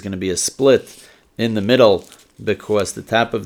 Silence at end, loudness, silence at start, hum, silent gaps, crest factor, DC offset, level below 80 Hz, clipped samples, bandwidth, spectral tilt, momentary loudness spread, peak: 0 s; -18 LUFS; 0.05 s; none; none; 18 dB; under 0.1%; -56 dBFS; under 0.1%; 18.5 kHz; -4 dB/octave; 11 LU; 0 dBFS